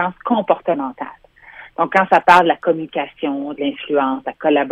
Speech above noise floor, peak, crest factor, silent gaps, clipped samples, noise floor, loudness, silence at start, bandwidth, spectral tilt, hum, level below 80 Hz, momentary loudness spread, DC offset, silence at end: 25 dB; 0 dBFS; 18 dB; none; under 0.1%; -41 dBFS; -17 LUFS; 0 s; 13.5 kHz; -6 dB/octave; none; -58 dBFS; 13 LU; under 0.1%; 0 s